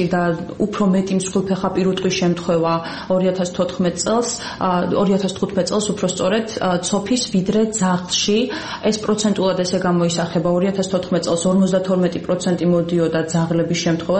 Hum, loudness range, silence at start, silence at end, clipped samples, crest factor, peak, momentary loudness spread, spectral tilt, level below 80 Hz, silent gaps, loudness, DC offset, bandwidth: none; 1 LU; 0 s; 0 s; under 0.1%; 12 dB; -6 dBFS; 4 LU; -5 dB/octave; -50 dBFS; none; -19 LUFS; 0.2%; 8.8 kHz